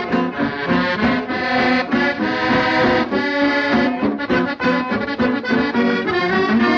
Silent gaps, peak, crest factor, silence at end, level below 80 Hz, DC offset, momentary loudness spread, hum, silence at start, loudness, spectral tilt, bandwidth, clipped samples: none; -4 dBFS; 14 dB; 0 s; -48 dBFS; under 0.1%; 4 LU; none; 0 s; -18 LUFS; -6.5 dB/octave; 7.2 kHz; under 0.1%